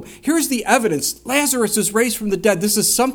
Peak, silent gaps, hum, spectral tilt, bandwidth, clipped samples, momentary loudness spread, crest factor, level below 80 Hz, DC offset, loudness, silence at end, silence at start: 0 dBFS; none; none; -2.5 dB/octave; over 20 kHz; under 0.1%; 4 LU; 18 dB; -50 dBFS; under 0.1%; -17 LUFS; 0 s; 0 s